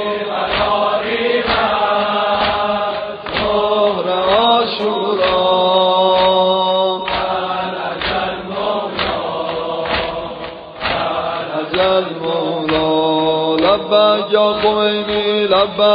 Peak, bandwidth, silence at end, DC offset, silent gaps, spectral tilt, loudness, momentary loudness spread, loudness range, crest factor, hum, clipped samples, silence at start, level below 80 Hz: 0 dBFS; 5.2 kHz; 0 s; under 0.1%; none; -1.5 dB/octave; -16 LUFS; 8 LU; 6 LU; 16 dB; none; under 0.1%; 0 s; -44 dBFS